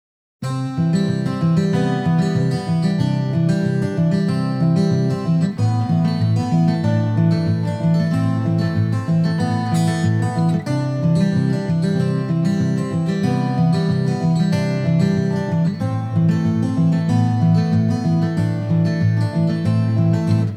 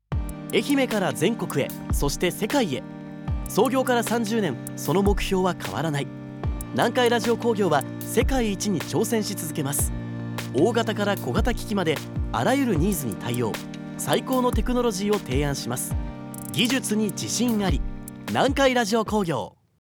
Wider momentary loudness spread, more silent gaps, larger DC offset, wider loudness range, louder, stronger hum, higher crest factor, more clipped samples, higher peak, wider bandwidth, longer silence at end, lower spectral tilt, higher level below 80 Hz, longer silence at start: second, 3 LU vs 9 LU; neither; neither; about the same, 1 LU vs 2 LU; first, -18 LUFS vs -24 LUFS; neither; second, 12 dB vs 18 dB; neither; about the same, -6 dBFS vs -6 dBFS; second, 10 kHz vs over 20 kHz; second, 0 s vs 0.5 s; first, -8 dB/octave vs -5 dB/octave; second, -54 dBFS vs -36 dBFS; first, 0.4 s vs 0.1 s